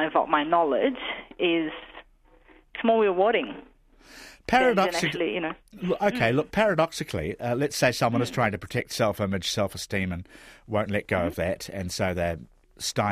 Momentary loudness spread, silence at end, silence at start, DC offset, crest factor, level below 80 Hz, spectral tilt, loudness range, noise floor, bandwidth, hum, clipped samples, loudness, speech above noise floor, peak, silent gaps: 12 LU; 0 s; 0 s; under 0.1%; 20 dB; -52 dBFS; -5 dB/octave; 4 LU; -57 dBFS; 15.5 kHz; none; under 0.1%; -26 LUFS; 31 dB; -6 dBFS; none